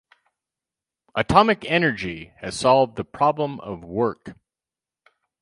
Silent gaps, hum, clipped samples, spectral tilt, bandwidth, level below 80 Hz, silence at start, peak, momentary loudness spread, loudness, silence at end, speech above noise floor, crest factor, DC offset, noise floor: none; none; under 0.1%; -5 dB/octave; 11.5 kHz; -48 dBFS; 1.15 s; 0 dBFS; 15 LU; -21 LUFS; 1.1 s; over 69 dB; 24 dB; under 0.1%; under -90 dBFS